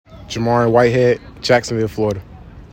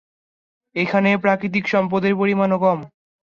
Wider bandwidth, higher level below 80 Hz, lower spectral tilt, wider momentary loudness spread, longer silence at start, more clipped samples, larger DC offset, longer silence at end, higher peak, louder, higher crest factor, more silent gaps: first, 16.5 kHz vs 7 kHz; first, -42 dBFS vs -62 dBFS; second, -6 dB/octave vs -7.5 dB/octave; first, 9 LU vs 6 LU; second, 0.1 s vs 0.75 s; neither; neither; second, 0.05 s vs 0.35 s; first, 0 dBFS vs -4 dBFS; first, -16 LUFS vs -19 LUFS; about the same, 16 dB vs 16 dB; neither